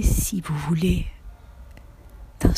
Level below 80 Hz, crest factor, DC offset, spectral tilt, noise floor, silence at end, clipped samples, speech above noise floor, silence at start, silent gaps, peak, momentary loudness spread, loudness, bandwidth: -28 dBFS; 20 dB; under 0.1%; -5.5 dB/octave; -44 dBFS; 0 s; under 0.1%; 22 dB; 0 s; none; -4 dBFS; 24 LU; -24 LUFS; 15.5 kHz